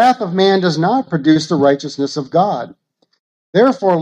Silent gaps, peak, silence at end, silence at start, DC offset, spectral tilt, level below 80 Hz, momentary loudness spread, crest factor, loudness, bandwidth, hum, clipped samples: 3.19-3.53 s; 0 dBFS; 0 s; 0 s; under 0.1%; -6 dB/octave; -62 dBFS; 8 LU; 14 dB; -15 LUFS; 10 kHz; none; under 0.1%